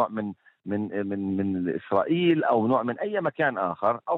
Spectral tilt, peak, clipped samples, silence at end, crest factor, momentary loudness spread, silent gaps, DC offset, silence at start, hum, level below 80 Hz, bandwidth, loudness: -9.5 dB/octave; -8 dBFS; under 0.1%; 0 s; 18 dB; 9 LU; none; under 0.1%; 0 s; none; -72 dBFS; 4.1 kHz; -26 LUFS